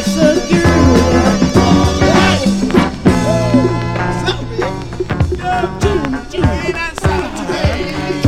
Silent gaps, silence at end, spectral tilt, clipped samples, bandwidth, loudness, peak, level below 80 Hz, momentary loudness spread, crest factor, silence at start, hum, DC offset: none; 0 s; -6 dB/octave; 0.1%; 14.5 kHz; -14 LUFS; 0 dBFS; -24 dBFS; 9 LU; 12 dB; 0 s; none; 0.8%